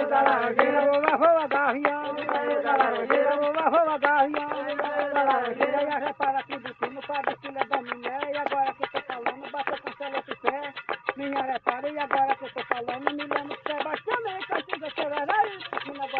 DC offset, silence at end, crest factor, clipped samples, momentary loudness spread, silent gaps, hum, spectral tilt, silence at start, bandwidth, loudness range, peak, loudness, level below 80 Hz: under 0.1%; 0 s; 24 dB; under 0.1%; 10 LU; none; none; -1 dB/octave; 0 s; 4.7 kHz; 7 LU; -2 dBFS; -26 LUFS; -72 dBFS